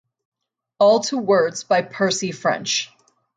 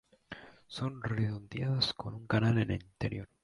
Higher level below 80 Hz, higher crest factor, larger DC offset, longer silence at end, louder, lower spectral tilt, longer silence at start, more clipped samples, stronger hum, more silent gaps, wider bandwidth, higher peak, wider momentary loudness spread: second, -70 dBFS vs -56 dBFS; about the same, 16 dB vs 18 dB; neither; first, 0.5 s vs 0.2 s; first, -19 LUFS vs -34 LUFS; second, -3 dB/octave vs -6.5 dB/octave; first, 0.8 s vs 0.3 s; neither; neither; neither; second, 9.4 kHz vs 11.5 kHz; first, -4 dBFS vs -16 dBFS; second, 6 LU vs 20 LU